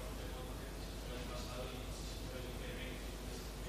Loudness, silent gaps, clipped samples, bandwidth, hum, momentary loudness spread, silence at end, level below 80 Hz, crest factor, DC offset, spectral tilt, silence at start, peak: -46 LUFS; none; under 0.1%; 15.5 kHz; none; 2 LU; 0 s; -48 dBFS; 12 dB; under 0.1%; -4.5 dB/octave; 0 s; -32 dBFS